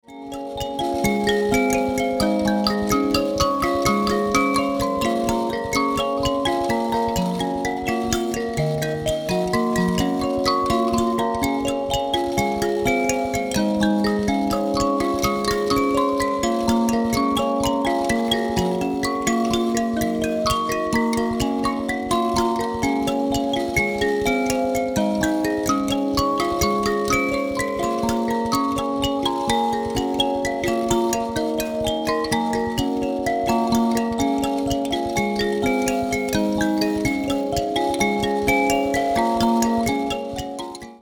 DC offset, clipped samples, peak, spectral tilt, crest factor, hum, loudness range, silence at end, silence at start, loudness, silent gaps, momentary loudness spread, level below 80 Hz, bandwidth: under 0.1%; under 0.1%; -4 dBFS; -4.5 dB/octave; 18 dB; none; 2 LU; 0.05 s; 0.1 s; -21 LUFS; none; 4 LU; -40 dBFS; 19.5 kHz